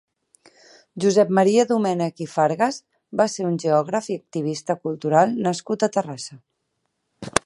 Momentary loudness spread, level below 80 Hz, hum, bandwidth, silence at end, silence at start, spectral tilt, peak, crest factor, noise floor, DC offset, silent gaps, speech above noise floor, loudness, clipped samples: 13 LU; -60 dBFS; none; 11.5 kHz; 0.05 s; 0.95 s; -5 dB/octave; 0 dBFS; 22 dB; -75 dBFS; under 0.1%; none; 54 dB; -21 LUFS; under 0.1%